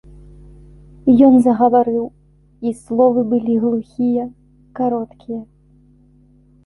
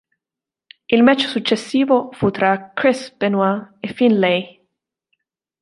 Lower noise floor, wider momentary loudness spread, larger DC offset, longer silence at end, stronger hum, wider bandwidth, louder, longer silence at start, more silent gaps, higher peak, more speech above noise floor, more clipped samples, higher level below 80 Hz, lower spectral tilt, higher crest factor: second, -51 dBFS vs -88 dBFS; first, 19 LU vs 7 LU; neither; about the same, 1.2 s vs 1.1 s; first, 50 Hz at -45 dBFS vs none; about the same, 11 kHz vs 11.5 kHz; about the same, -16 LUFS vs -17 LUFS; first, 1.05 s vs 0.9 s; neither; about the same, -2 dBFS vs -2 dBFS; second, 36 dB vs 71 dB; neither; first, -48 dBFS vs -58 dBFS; first, -9 dB/octave vs -5.5 dB/octave; about the same, 16 dB vs 18 dB